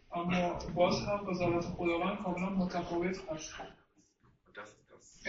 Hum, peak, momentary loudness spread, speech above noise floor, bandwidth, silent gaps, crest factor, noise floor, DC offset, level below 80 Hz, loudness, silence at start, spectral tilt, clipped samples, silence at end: none; -16 dBFS; 20 LU; 34 dB; 7.6 kHz; none; 20 dB; -68 dBFS; under 0.1%; -56 dBFS; -34 LUFS; 0.1 s; -5 dB/octave; under 0.1%; 0 s